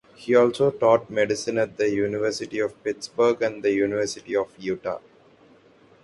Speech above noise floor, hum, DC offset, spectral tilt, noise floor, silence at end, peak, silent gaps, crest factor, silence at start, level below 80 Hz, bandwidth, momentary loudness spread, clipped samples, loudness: 32 dB; none; under 0.1%; -5 dB/octave; -55 dBFS; 1.05 s; -6 dBFS; none; 18 dB; 0.2 s; -62 dBFS; 11.5 kHz; 10 LU; under 0.1%; -24 LUFS